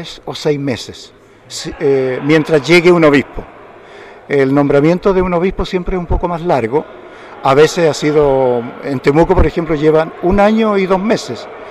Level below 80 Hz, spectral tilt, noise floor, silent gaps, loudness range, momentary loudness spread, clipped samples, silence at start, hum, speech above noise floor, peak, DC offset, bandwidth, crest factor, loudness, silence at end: -28 dBFS; -6 dB/octave; -36 dBFS; none; 2 LU; 15 LU; under 0.1%; 0 s; none; 23 dB; -2 dBFS; under 0.1%; 13 kHz; 12 dB; -13 LUFS; 0 s